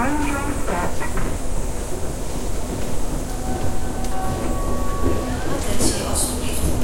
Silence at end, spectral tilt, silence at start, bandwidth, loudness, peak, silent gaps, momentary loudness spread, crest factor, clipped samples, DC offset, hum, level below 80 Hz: 0 s; -4.5 dB/octave; 0 s; 16.5 kHz; -25 LUFS; -4 dBFS; none; 7 LU; 14 dB; under 0.1%; under 0.1%; none; -26 dBFS